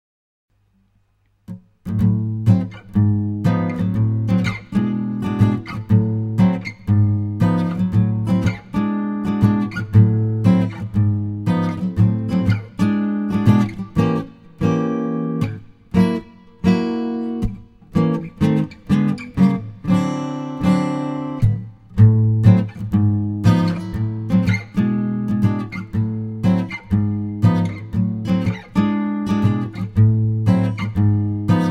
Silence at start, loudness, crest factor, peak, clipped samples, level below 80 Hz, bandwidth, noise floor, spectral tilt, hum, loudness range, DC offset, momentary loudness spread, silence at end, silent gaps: 1.5 s; -19 LUFS; 18 dB; 0 dBFS; under 0.1%; -40 dBFS; 8 kHz; -62 dBFS; -9 dB/octave; none; 4 LU; under 0.1%; 8 LU; 0 s; none